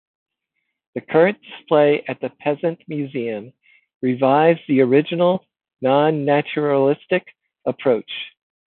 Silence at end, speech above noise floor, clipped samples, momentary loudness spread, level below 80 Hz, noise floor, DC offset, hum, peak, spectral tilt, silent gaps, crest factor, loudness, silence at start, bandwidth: 0.45 s; 58 dB; under 0.1%; 12 LU; -70 dBFS; -76 dBFS; under 0.1%; none; -2 dBFS; -11.5 dB/octave; 3.95-4.00 s; 18 dB; -19 LUFS; 0.95 s; 4.3 kHz